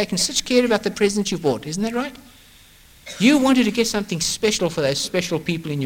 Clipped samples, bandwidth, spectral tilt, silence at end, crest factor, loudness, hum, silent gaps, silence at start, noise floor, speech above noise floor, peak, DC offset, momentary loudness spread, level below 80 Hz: under 0.1%; 17 kHz; -4 dB/octave; 0 s; 16 dB; -20 LUFS; none; none; 0 s; -49 dBFS; 29 dB; -4 dBFS; under 0.1%; 8 LU; -50 dBFS